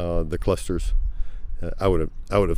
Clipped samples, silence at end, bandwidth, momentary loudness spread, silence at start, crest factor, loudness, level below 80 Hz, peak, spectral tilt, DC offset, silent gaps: under 0.1%; 0 s; 12 kHz; 12 LU; 0 s; 16 dB; -26 LUFS; -26 dBFS; -6 dBFS; -7 dB/octave; under 0.1%; none